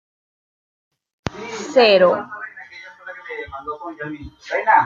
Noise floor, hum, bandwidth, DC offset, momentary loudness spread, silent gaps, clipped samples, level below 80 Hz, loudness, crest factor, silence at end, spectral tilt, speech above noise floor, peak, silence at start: -40 dBFS; none; 7.6 kHz; under 0.1%; 22 LU; none; under 0.1%; -52 dBFS; -18 LUFS; 20 dB; 0 s; -4 dB/octave; 23 dB; -2 dBFS; 1.25 s